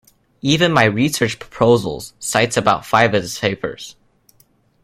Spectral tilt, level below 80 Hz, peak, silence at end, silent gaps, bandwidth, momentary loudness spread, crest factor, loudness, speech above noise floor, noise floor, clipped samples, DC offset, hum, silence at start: -4.5 dB/octave; -50 dBFS; 0 dBFS; 0.9 s; none; 16 kHz; 12 LU; 18 dB; -17 LUFS; 40 dB; -57 dBFS; under 0.1%; under 0.1%; none; 0.45 s